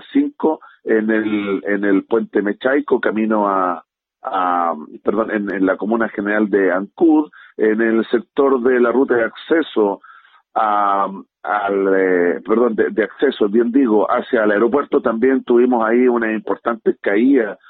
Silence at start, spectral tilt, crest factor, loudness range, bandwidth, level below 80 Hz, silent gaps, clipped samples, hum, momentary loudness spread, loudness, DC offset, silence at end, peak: 0.1 s; -10 dB/octave; 14 dB; 3 LU; 4.2 kHz; -62 dBFS; none; under 0.1%; none; 6 LU; -17 LUFS; under 0.1%; 0.15 s; -2 dBFS